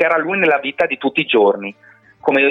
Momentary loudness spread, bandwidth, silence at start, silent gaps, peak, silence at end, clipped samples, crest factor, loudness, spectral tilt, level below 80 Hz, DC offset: 9 LU; 6.2 kHz; 0 s; none; -4 dBFS; 0 s; under 0.1%; 14 dB; -16 LUFS; -6.5 dB/octave; -64 dBFS; under 0.1%